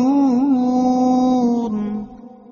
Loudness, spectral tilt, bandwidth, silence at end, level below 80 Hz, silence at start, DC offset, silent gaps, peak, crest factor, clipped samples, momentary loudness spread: -17 LUFS; -7.5 dB/octave; 7 kHz; 0.25 s; -52 dBFS; 0 s; under 0.1%; none; -6 dBFS; 10 dB; under 0.1%; 10 LU